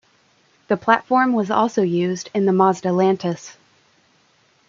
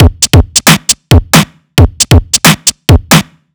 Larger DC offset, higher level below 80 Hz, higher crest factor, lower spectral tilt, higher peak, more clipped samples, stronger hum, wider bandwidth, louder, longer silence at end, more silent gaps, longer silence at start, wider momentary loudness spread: neither; second, -68 dBFS vs -16 dBFS; first, 20 dB vs 8 dB; first, -6 dB/octave vs -3.5 dB/octave; about the same, -2 dBFS vs 0 dBFS; second, under 0.1% vs 20%; neither; second, 7.6 kHz vs over 20 kHz; second, -19 LUFS vs -7 LUFS; first, 1.2 s vs 0.35 s; neither; first, 0.7 s vs 0 s; first, 8 LU vs 4 LU